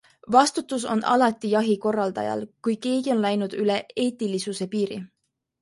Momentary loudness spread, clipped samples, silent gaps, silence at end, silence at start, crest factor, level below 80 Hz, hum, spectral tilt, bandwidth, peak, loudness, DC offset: 9 LU; under 0.1%; none; 0.55 s; 0.25 s; 20 dB; -70 dBFS; none; -4.5 dB/octave; 11.5 kHz; -4 dBFS; -24 LUFS; under 0.1%